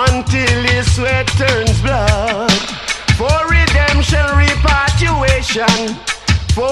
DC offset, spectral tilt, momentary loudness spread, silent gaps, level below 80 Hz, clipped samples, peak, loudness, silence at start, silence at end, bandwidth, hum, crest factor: under 0.1%; -4.5 dB/octave; 4 LU; none; -20 dBFS; under 0.1%; 0 dBFS; -13 LUFS; 0 s; 0 s; 12.5 kHz; none; 12 dB